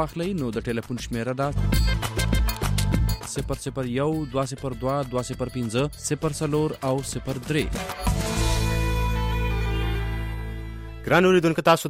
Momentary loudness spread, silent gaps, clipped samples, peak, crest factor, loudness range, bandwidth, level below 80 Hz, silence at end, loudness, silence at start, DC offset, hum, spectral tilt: 9 LU; none; under 0.1%; -6 dBFS; 18 dB; 2 LU; 16 kHz; -30 dBFS; 0 s; -25 LUFS; 0 s; under 0.1%; none; -5.5 dB/octave